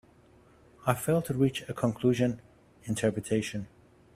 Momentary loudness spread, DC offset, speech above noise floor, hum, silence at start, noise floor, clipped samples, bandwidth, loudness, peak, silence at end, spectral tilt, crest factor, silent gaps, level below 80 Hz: 14 LU; under 0.1%; 30 dB; none; 0.8 s; -59 dBFS; under 0.1%; 16 kHz; -30 LUFS; -8 dBFS; 0.5 s; -6 dB/octave; 24 dB; none; -60 dBFS